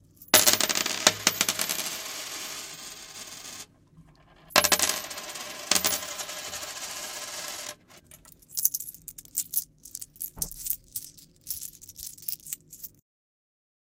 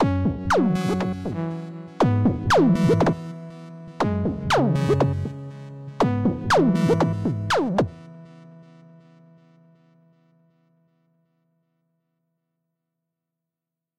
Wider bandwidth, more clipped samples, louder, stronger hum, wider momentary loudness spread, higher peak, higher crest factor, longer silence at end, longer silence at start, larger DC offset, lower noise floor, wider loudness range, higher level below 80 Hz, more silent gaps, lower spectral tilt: first, 17 kHz vs 14 kHz; neither; second, -27 LUFS vs -22 LUFS; neither; about the same, 19 LU vs 19 LU; first, 0 dBFS vs -10 dBFS; first, 32 dB vs 14 dB; second, 1.1 s vs 5.35 s; first, 0.2 s vs 0 s; neither; second, -56 dBFS vs -87 dBFS; about the same, 9 LU vs 7 LU; second, -60 dBFS vs -46 dBFS; neither; second, 0 dB/octave vs -7 dB/octave